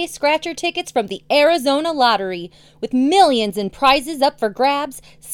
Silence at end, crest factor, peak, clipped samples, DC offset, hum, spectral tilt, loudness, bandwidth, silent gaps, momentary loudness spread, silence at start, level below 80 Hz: 0 s; 16 dB; 0 dBFS; under 0.1%; under 0.1%; none; -3.5 dB/octave; -17 LUFS; 17.5 kHz; none; 13 LU; 0 s; -52 dBFS